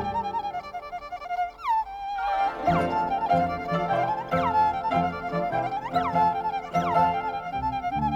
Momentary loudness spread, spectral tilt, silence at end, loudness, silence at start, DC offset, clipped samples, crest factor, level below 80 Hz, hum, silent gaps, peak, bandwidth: 8 LU; -7 dB/octave; 0 s; -26 LUFS; 0 s; under 0.1%; under 0.1%; 16 dB; -50 dBFS; none; none; -10 dBFS; 15.5 kHz